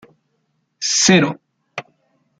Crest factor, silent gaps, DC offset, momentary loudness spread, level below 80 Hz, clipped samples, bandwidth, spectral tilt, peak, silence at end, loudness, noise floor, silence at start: 20 dB; none; under 0.1%; 21 LU; -60 dBFS; under 0.1%; 9.4 kHz; -3 dB/octave; -2 dBFS; 0.6 s; -15 LUFS; -68 dBFS; 0.8 s